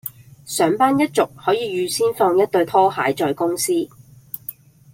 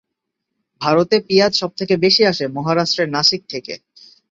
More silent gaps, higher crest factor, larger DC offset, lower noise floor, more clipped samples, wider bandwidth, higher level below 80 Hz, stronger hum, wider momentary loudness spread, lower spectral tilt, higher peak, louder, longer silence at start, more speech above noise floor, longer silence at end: neither; about the same, 16 dB vs 18 dB; neither; second, -39 dBFS vs -78 dBFS; neither; first, 16.5 kHz vs 7.8 kHz; about the same, -62 dBFS vs -58 dBFS; neither; about the same, 15 LU vs 14 LU; about the same, -4 dB/octave vs -4 dB/octave; second, -4 dBFS vs 0 dBFS; second, -19 LUFS vs -16 LUFS; second, 0.05 s vs 0.8 s; second, 20 dB vs 61 dB; second, 0.4 s vs 0.55 s